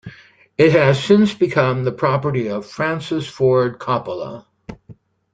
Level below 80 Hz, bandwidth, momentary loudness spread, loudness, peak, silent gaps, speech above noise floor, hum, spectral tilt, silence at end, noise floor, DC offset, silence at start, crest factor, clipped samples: -54 dBFS; 9.2 kHz; 15 LU; -17 LUFS; -2 dBFS; none; 29 dB; none; -7 dB/octave; 0.4 s; -46 dBFS; under 0.1%; 0.05 s; 16 dB; under 0.1%